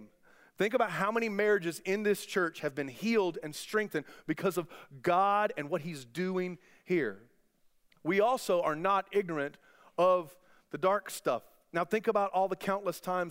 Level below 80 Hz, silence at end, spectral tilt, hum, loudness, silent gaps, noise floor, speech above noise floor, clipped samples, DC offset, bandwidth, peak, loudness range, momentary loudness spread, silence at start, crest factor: -76 dBFS; 0 s; -5 dB/octave; none; -32 LUFS; none; -68 dBFS; 37 dB; under 0.1%; under 0.1%; 16 kHz; -14 dBFS; 2 LU; 10 LU; 0 s; 18 dB